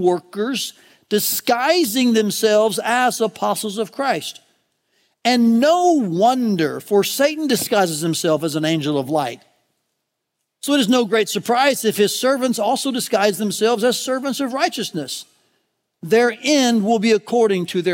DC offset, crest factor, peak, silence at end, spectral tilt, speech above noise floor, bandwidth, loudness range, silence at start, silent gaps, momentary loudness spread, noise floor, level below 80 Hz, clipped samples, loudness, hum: under 0.1%; 18 dB; -2 dBFS; 0 s; -4 dB/octave; 59 dB; 16.5 kHz; 3 LU; 0 s; none; 7 LU; -77 dBFS; -72 dBFS; under 0.1%; -18 LUFS; none